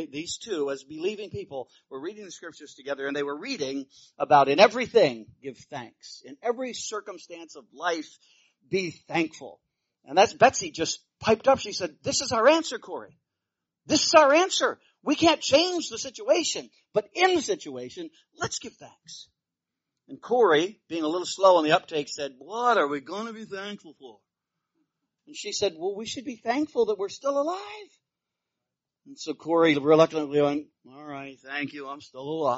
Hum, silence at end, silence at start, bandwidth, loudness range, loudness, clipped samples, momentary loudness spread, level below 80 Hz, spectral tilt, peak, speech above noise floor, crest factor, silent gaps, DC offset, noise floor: none; 0 s; 0 s; 8 kHz; 11 LU; -25 LUFS; under 0.1%; 22 LU; -66 dBFS; -2 dB/octave; -2 dBFS; 61 dB; 24 dB; none; under 0.1%; -87 dBFS